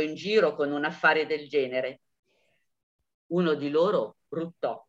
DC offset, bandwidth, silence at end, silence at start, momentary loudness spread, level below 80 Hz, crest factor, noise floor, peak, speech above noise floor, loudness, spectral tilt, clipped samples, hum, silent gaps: under 0.1%; 7.8 kHz; 0.1 s; 0 s; 11 LU; -80 dBFS; 20 dB; -73 dBFS; -8 dBFS; 46 dB; -27 LUFS; -6 dB/octave; under 0.1%; none; 2.19-2.23 s, 2.83-2.99 s, 3.14-3.30 s